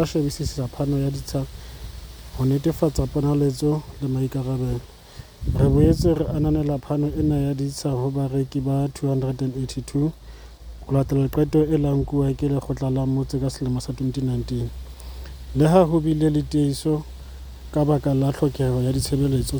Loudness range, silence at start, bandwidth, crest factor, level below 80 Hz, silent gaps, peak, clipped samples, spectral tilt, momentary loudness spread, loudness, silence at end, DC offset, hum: 3 LU; 0 s; over 20 kHz; 20 dB; -36 dBFS; none; -2 dBFS; under 0.1%; -7.5 dB/octave; 18 LU; -23 LUFS; 0 s; under 0.1%; none